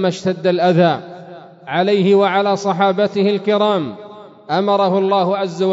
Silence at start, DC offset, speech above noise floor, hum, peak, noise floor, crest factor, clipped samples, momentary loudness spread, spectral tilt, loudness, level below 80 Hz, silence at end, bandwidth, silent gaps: 0 s; under 0.1%; 22 dB; none; -2 dBFS; -37 dBFS; 14 dB; under 0.1%; 12 LU; -6.5 dB/octave; -16 LUFS; -66 dBFS; 0 s; 7.8 kHz; none